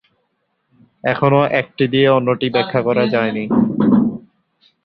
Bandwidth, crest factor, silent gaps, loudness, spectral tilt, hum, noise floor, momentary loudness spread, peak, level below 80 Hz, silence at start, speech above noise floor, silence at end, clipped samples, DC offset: 5.6 kHz; 16 dB; none; -16 LUFS; -10 dB/octave; none; -68 dBFS; 6 LU; -2 dBFS; -54 dBFS; 1.05 s; 53 dB; 0.65 s; under 0.1%; under 0.1%